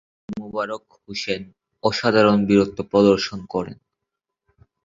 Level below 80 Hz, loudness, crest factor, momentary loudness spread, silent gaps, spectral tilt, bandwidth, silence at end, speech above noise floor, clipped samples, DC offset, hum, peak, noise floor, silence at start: -54 dBFS; -20 LUFS; 20 dB; 17 LU; none; -6 dB/octave; 7.6 kHz; 1.1 s; 63 dB; under 0.1%; under 0.1%; none; -2 dBFS; -83 dBFS; 0.3 s